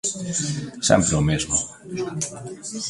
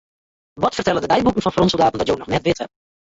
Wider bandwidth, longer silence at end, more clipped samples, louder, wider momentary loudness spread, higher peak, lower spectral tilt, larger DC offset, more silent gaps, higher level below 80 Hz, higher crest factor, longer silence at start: first, 11.5 kHz vs 8 kHz; second, 0 s vs 0.5 s; neither; second, -23 LUFS vs -19 LUFS; first, 13 LU vs 6 LU; about the same, -4 dBFS vs -4 dBFS; second, -4 dB/octave vs -5.5 dB/octave; neither; neither; about the same, -42 dBFS vs -44 dBFS; about the same, 20 dB vs 16 dB; second, 0.05 s vs 0.55 s